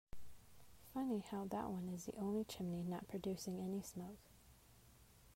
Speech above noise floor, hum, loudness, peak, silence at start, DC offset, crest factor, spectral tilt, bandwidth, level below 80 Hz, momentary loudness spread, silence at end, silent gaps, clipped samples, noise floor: 22 dB; none; -46 LUFS; -32 dBFS; 0.15 s; under 0.1%; 16 dB; -6 dB/octave; 16 kHz; -68 dBFS; 23 LU; 0 s; none; under 0.1%; -67 dBFS